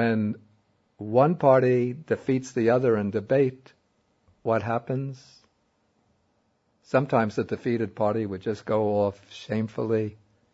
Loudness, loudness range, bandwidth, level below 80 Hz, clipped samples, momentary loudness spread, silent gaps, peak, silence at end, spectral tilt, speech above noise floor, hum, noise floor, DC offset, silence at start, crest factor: -25 LUFS; 7 LU; 8 kHz; -66 dBFS; under 0.1%; 11 LU; none; -6 dBFS; 0.4 s; -8 dB/octave; 45 dB; none; -70 dBFS; under 0.1%; 0 s; 20 dB